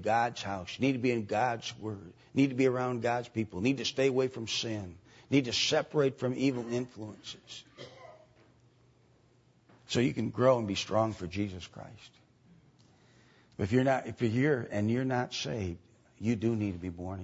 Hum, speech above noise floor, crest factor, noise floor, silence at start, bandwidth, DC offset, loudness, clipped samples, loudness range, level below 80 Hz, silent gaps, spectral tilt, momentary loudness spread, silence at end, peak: none; 34 dB; 20 dB; -65 dBFS; 0 s; 8 kHz; under 0.1%; -31 LUFS; under 0.1%; 7 LU; -64 dBFS; none; -5.5 dB/octave; 17 LU; 0 s; -12 dBFS